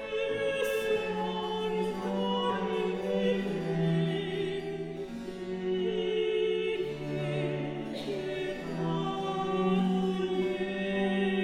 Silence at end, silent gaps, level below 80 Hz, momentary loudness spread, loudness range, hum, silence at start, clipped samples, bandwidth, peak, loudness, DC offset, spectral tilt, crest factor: 0 s; none; -58 dBFS; 7 LU; 2 LU; none; 0 s; under 0.1%; 16 kHz; -16 dBFS; -31 LUFS; under 0.1%; -6.5 dB/octave; 14 dB